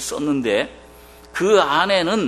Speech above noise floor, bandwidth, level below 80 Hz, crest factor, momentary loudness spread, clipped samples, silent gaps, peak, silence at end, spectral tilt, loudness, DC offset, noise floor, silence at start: 26 dB; 13.5 kHz; -50 dBFS; 18 dB; 11 LU; under 0.1%; none; -2 dBFS; 0 s; -3.5 dB/octave; -18 LUFS; under 0.1%; -44 dBFS; 0 s